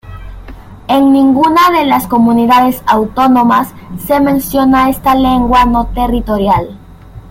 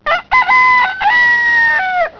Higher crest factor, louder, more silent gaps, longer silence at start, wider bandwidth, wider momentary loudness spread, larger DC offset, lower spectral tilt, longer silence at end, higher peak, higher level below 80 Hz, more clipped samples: about the same, 10 dB vs 10 dB; about the same, -10 LUFS vs -10 LUFS; neither; about the same, 0.05 s vs 0.05 s; first, 17 kHz vs 5.4 kHz; first, 7 LU vs 4 LU; neither; first, -5.5 dB/octave vs -2 dB/octave; about the same, 0.1 s vs 0.1 s; about the same, 0 dBFS vs -2 dBFS; first, -28 dBFS vs -44 dBFS; neither